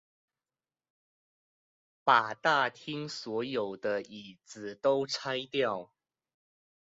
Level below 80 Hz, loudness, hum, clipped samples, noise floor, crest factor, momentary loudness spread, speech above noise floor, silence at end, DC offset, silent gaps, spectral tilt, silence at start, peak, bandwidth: -78 dBFS; -31 LUFS; none; under 0.1%; under -90 dBFS; 26 dB; 18 LU; over 59 dB; 1 s; under 0.1%; none; -1.5 dB/octave; 2.05 s; -8 dBFS; 7.6 kHz